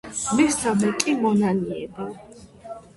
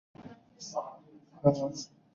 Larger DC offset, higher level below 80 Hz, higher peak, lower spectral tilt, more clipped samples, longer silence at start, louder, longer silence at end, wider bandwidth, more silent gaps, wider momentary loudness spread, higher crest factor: neither; first, -54 dBFS vs -66 dBFS; first, 0 dBFS vs -10 dBFS; second, -4.5 dB/octave vs -8 dB/octave; neither; second, 0.05 s vs 0.2 s; first, -22 LUFS vs -32 LUFS; second, 0.15 s vs 0.3 s; first, 11.5 kHz vs 7.6 kHz; neither; second, 19 LU vs 23 LU; about the same, 24 dB vs 24 dB